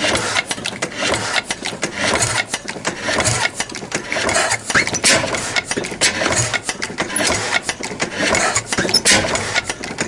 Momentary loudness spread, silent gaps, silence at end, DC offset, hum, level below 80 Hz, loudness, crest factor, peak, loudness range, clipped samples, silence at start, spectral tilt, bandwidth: 10 LU; none; 0 s; under 0.1%; none; -44 dBFS; -17 LUFS; 20 dB; 0 dBFS; 2 LU; under 0.1%; 0 s; -1.5 dB/octave; 12 kHz